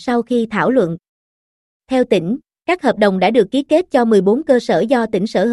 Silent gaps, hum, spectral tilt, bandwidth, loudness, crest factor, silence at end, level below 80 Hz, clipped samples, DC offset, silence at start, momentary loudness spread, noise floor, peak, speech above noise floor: 1.09-1.80 s; none; -6.5 dB/octave; 12 kHz; -16 LUFS; 14 dB; 0 s; -54 dBFS; under 0.1%; under 0.1%; 0 s; 7 LU; under -90 dBFS; -2 dBFS; over 75 dB